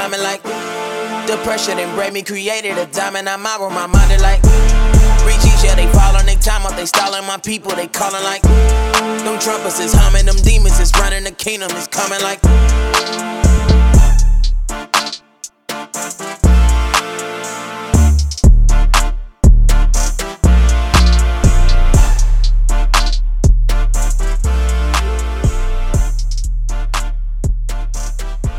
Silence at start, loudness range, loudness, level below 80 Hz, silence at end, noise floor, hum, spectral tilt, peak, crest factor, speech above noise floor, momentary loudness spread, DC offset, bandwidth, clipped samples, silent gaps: 0 s; 5 LU; -15 LUFS; -12 dBFS; 0 s; -36 dBFS; none; -4.5 dB/octave; 0 dBFS; 10 dB; 24 dB; 11 LU; under 0.1%; 15.5 kHz; under 0.1%; none